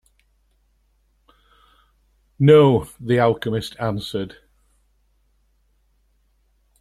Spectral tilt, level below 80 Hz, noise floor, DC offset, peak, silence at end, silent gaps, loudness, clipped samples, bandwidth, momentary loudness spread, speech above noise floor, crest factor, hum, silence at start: -7.5 dB/octave; -54 dBFS; -63 dBFS; under 0.1%; -2 dBFS; 2.5 s; none; -18 LUFS; under 0.1%; 13.5 kHz; 16 LU; 46 dB; 22 dB; none; 2.4 s